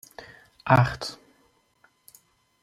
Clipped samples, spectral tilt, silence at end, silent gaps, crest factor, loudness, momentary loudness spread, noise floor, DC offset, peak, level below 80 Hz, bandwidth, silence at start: under 0.1%; -6.5 dB/octave; 1.5 s; none; 24 dB; -23 LUFS; 24 LU; -65 dBFS; under 0.1%; -4 dBFS; -54 dBFS; 14.5 kHz; 0.65 s